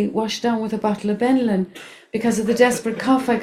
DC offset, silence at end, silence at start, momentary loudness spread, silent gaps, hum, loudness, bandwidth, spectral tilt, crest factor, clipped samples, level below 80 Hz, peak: under 0.1%; 0 s; 0 s; 7 LU; none; none; -20 LUFS; 15 kHz; -5 dB/octave; 18 dB; under 0.1%; -58 dBFS; -2 dBFS